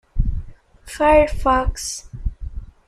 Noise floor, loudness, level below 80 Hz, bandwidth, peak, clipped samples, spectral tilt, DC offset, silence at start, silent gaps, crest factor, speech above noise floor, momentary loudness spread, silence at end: -39 dBFS; -19 LUFS; -26 dBFS; 14.5 kHz; -2 dBFS; under 0.1%; -5 dB/octave; under 0.1%; 0.15 s; none; 18 dB; 22 dB; 21 LU; 0.15 s